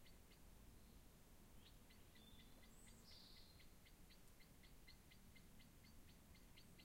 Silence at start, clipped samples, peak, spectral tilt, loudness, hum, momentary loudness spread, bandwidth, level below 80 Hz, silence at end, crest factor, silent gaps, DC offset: 0 s; under 0.1%; -50 dBFS; -3.5 dB/octave; -67 LUFS; none; 4 LU; 16 kHz; -70 dBFS; 0 s; 14 dB; none; under 0.1%